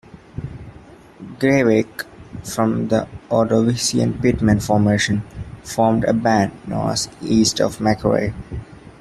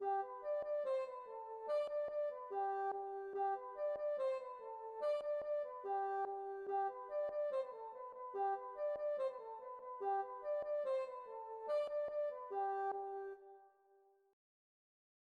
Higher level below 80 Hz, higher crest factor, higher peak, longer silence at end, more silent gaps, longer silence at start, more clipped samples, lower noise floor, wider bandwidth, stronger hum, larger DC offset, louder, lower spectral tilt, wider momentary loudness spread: first, -42 dBFS vs -84 dBFS; about the same, 16 dB vs 12 dB; first, -2 dBFS vs -30 dBFS; second, 0.1 s vs 1.65 s; neither; first, 0.15 s vs 0 s; neither; second, -43 dBFS vs -72 dBFS; first, 13.5 kHz vs 8.2 kHz; neither; neither; first, -18 LUFS vs -43 LUFS; about the same, -5 dB/octave vs -4.5 dB/octave; first, 17 LU vs 10 LU